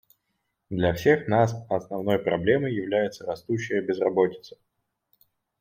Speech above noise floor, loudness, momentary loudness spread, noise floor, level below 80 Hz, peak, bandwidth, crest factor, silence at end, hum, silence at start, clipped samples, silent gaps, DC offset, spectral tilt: 53 dB; -25 LUFS; 9 LU; -78 dBFS; -58 dBFS; -6 dBFS; 16 kHz; 20 dB; 1.1 s; none; 0.7 s; under 0.1%; none; under 0.1%; -7 dB/octave